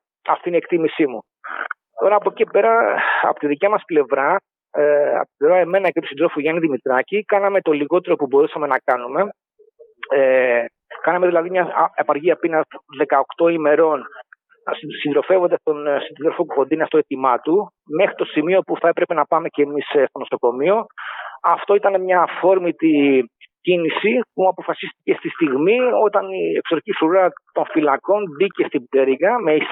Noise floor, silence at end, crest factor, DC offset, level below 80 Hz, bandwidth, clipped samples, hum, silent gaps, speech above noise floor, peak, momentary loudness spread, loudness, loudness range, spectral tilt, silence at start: -50 dBFS; 0 s; 16 dB; under 0.1%; -78 dBFS; 4.1 kHz; under 0.1%; none; none; 33 dB; -2 dBFS; 8 LU; -18 LUFS; 2 LU; -8.5 dB/octave; 0.25 s